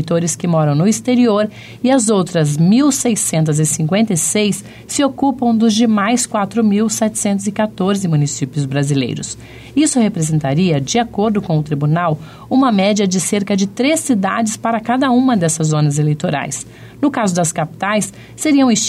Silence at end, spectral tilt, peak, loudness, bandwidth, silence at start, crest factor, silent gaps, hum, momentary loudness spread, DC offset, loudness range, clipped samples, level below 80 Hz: 0 s; -5 dB/octave; -4 dBFS; -15 LUFS; 15 kHz; 0 s; 10 dB; none; none; 7 LU; under 0.1%; 3 LU; under 0.1%; -50 dBFS